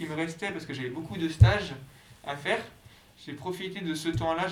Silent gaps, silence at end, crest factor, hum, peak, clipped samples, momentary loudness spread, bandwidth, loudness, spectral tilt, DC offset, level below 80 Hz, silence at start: none; 0 s; 24 dB; none; -6 dBFS; under 0.1%; 21 LU; 14 kHz; -29 LUFS; -6 dB/octave; under 0.1%; -42 dBFS; 0 s